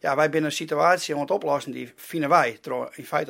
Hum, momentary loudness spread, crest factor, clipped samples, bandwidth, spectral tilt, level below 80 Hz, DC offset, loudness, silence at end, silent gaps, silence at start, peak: none; 11 LU; 20 dB; under 0.1%; 16.5 kHz; -4.5 dB/octave; -74 dBFS; under 0.1%; -24 LUFS; 0 s; none; 0.05 s; -4 dBFS